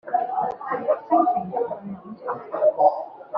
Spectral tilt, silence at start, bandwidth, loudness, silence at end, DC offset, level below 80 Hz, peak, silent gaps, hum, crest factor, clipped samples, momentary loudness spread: -6.5 dB/octave; 0.05 s; 5.2 kHz; -23 LUFS; 0 s; under 0.1%; -70 dBFS; -4 dBFS; none; none; 18 dB; under 0.1%; 14 LU